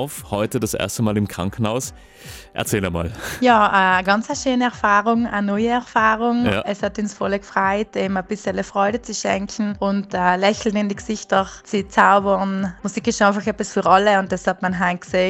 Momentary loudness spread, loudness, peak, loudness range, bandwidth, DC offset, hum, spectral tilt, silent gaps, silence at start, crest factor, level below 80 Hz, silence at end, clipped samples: 10 LU; -19 LUFS; 0 dBFS; 4 LU; 16 kHz; under 0.1%; none; -4.5 dB/octave; none; 0 s; 20 dB; -46 dBFS; 0 s; under 0.1%